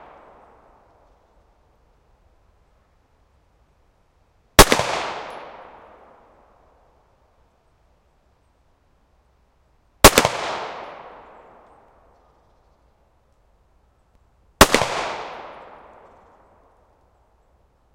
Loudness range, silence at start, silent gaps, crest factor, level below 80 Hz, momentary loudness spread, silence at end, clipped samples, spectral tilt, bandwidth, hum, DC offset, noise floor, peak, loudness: 10 LU; 4.6 s; none; 24 dB; -36 dBFS; 29 LU; 2.4 s; 0.1%; -2.5 dB/octave; 16 kHz; none; under 0.1%; -61 dBFS; 0 dBFS; -16 LUFS